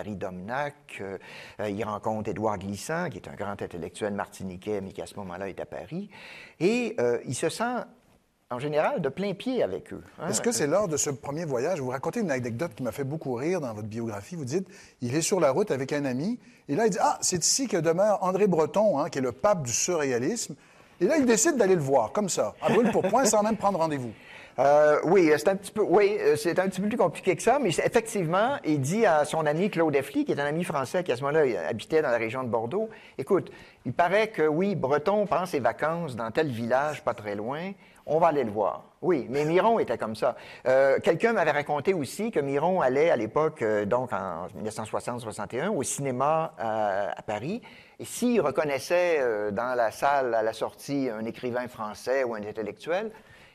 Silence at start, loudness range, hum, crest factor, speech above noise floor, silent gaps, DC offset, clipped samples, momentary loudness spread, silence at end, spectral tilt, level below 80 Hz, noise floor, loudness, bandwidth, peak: 0 s; 7 LU; none; 16 dB; 37 dB; none; under 0.1%; under 0.1%; 13 LU; 0.35 s; -4.5 dB/octave; -64 dBFS; -64 dBFS; -27 LUFS; 14 kHz; -10 dBFS